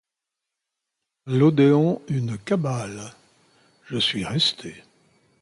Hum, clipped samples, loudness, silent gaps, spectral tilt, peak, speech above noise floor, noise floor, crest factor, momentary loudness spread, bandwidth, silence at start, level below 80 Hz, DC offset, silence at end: none; under 0.1%; -22 LUFS; none; -6 dB/octave; -6 dBFS; 63 dB; -85 dBFS; 18 dB; 20 LU; 11.5 kHz; 1.25 s; -60 dBFS; under 0.1%; 0.6 s